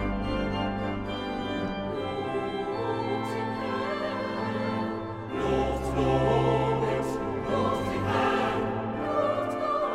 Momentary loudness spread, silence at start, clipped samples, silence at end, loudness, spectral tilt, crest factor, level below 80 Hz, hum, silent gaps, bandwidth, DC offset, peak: 7 LU; 0 s; under 0.1%; 0 s; -29 LUFS; -7 dB/octave; 16 dB; -44 dBFS; none; none; 14.5 kHz; under 0.1%; -12 dBFS